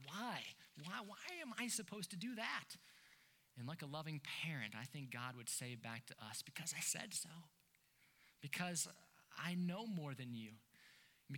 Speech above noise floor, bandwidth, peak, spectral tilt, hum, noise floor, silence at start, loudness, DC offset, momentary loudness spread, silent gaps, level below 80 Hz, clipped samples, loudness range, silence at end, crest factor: 28 dB; 19 kHz; -26 dBFS; -3 dB/octave; none; -76 dBFS; 0 s; -47 LUFS; under 0.1%; 16 LU; none; under -90 dBFS; under 0.1%; 2 LU; 0 s; 22 dB